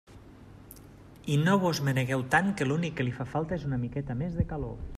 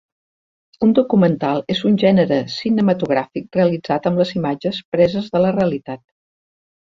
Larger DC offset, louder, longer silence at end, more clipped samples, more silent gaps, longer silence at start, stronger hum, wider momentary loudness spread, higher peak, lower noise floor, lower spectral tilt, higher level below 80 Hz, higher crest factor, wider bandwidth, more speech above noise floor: neither; second, -29 LUFS vs -18 LUFS; second, 0 s vs 0.9 s; neither; second, none vs 4.85-4.92 s; second, 0.1 s vs 0.8 s; neither; first, 17 LU vs 7 LU; second, -12 dBFS vs -2 dBFS; second, -50 dBFS vs under -90 dBFS; second, -6.5 dB/octave vs -8 dB/octave; first, -48 dBFS vs -54 dBFS; about the same, 18 dB vs 16 dB; first, 14.5 kHz vs 7.4 kHz; second, 22 dB vs over 73 dB